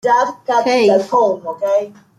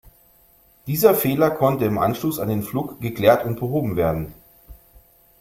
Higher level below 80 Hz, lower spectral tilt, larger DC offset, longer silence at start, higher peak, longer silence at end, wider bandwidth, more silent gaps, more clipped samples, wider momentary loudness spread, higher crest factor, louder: second, -66 dBFS vs -48 dBFS; second, -4.5 dB/octave vs -6.5 dB/octave; neither; about the same, 0.05 s vs 0.05 s; about the same, -2 dBFS vs -2 dBFS; second, 0.3 s vs 0.65 s; second, 13 kHz vs 16.5 kHz; neither; neither; second, 5 LU vs 11 LU; second, 12 dB vs 20 dB; first, -15 LUFS vs -20 LUFS